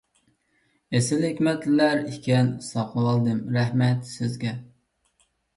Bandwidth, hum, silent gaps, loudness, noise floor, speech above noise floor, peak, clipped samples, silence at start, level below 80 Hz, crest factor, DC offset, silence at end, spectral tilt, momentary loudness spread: 11.5 kHz; none; none; -24 LUFS; -68 dBFS; 45 dB; -8 dBFS; under 0.1%; 0.9 s; -62 dBFS; 16 dB; under 0.1%; 0.9 s; -6.5 dB/octave; 9 LU